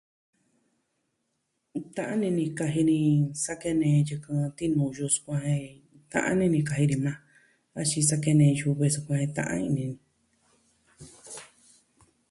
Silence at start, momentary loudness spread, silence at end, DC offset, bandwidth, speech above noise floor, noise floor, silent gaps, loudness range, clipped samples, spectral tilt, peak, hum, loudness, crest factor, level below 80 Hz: 1.75 s; 16 LU; 0.85 s; under 0.1%; 11.5 kHz; 52 dB; -78 dBFS; none; 5 LU; under 0.1%; -5.5 dB/octave; -10 dBFS; none; -27 LUFS; 18 dB; -62 dBFS